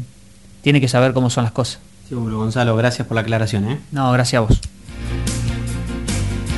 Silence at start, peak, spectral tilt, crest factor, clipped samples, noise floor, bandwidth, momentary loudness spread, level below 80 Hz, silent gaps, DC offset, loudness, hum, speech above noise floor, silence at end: 0 s; 0 dBFS; -5.5 dB/octave; 18 dB; under 0.1%; -45 dBFS; 12 kHz; 11 LU; -30 dBFS; none; 0.4%; -19 LUFS; none; 28 dB; 0 s